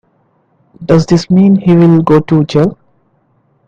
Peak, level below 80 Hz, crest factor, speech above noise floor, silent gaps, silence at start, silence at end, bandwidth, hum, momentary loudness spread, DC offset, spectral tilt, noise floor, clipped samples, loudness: 0 dBFS; -42 dBFS; 10 dB; 47 dB; none; 0.8 s; 0.95 s; 7.6 kHz; none; 6 LU; under 0.1%; -8 dB/octave; -55 dBFS; 0.1%; -9 LUFS